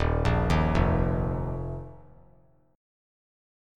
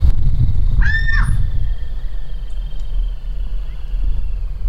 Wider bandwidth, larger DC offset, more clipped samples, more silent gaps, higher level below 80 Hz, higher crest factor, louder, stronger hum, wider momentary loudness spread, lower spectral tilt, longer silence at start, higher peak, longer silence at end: about the same, 10.5 kHz vs 10 kHz; neither; neither; neither; second, -34 dBFS vs -16 dBFS; about the same, 18 dB vs 14 dB; second, -27 LUFS vs -22 LUFS; neither; about the same, 14 LU vs 13 LU; first, -8 dB/octave vs -6.5 dB/octave; about the same, 0 s vs 0 s; second, -10 dBFS vs 0 dBFS; first, 1.75 s vs 0 s